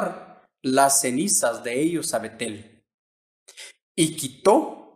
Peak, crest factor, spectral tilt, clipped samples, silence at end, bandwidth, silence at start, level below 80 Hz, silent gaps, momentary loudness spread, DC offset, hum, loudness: -4 dBFS; 20 dB; -3 dB/octave; under 0.1%; 0.15 s; 15.5 kHz; 0 s; -66 dBFS; 2.94-3.46 s, 3.82-3.95 s; 23 LU; under 0.1%; none; -22 LUFS